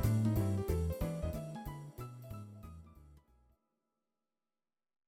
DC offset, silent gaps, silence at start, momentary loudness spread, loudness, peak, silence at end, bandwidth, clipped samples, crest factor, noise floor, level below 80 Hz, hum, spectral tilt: under 0.1%; none; 0 s; 19 LU; -38 LUFS; -20 dBFS; 1.9 s; 16.5 kHz; under 0.1%; 20 dB; under -90 dBFS; -48 dBFS; none; -8 dB/octave